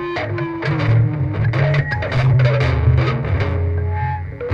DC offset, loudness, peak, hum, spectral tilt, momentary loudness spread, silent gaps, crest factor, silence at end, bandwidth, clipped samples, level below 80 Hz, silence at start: under 0.1%; -18 LUFS; -4 dBFS; none; -8.5 dB/octave; 8 LU; none; 14 dB; 0 s; 6.4 kHz; under 0.1%; -30 dBFS; 0 s